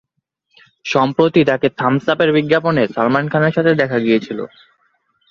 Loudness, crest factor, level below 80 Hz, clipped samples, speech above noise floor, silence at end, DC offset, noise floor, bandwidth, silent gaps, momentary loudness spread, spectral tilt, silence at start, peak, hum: -15 LUFS; 16 dB; -56 dBFS; under 0.1%; 55 dB; 0.85 s; under 0.1%; -70 dBFS; 7.2 kHz; none; 7 LU; -7 dB/octave; 0.85 s; 0 dBFS; none